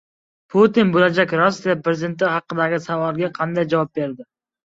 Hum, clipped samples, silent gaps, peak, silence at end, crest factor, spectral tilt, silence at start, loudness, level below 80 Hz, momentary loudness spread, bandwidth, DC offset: none; under 0.1%; none; -2 dBFS; 0.45 s; 18 dB; -6.5 dB/octave; 0.55 s; -19 LUFS; -62 dBFS; 8 LU; 7.8 kHz; under 0.1%